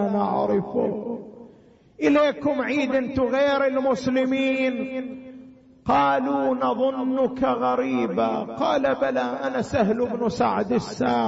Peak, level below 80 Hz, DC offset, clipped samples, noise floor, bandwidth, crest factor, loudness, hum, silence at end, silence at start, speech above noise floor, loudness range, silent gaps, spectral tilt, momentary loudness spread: -8 dBFS; -56 dBFS; under 0.1%; under 0.1%; -52 dBFS; 8 kHz; 14 dB; -23 LUFS; none; 0 s; 0 s; 30 dB; 2 LU; none; -6.5 dB/octave; 8 LU